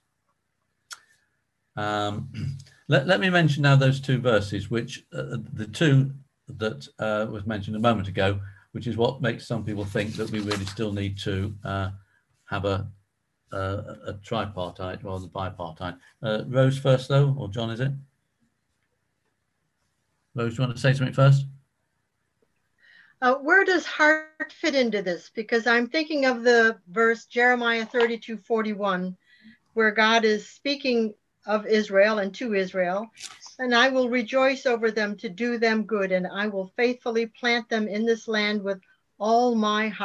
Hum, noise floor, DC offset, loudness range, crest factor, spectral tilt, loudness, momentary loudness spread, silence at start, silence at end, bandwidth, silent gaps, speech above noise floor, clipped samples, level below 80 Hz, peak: none; -76 dBFS; under 0.1%; 9 LU; 20 dB; -6 dB/octave; -24 LUFS; 15 LU; 0.9 s; 0 s; 11.5 kHz; none; 52 dB; under 0.1%; -54 dBFS; -6 dBFS